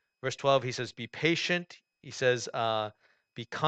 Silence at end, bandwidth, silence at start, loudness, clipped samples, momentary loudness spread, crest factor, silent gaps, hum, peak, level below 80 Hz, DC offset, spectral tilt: 0 s; 9 kHz; 0.25 s; -30 LUFS; under 0.1%; 18 LU; 20 dB; none; none; -12 dBFS; -72 dBFS; under 0.1%; -4 dB/octave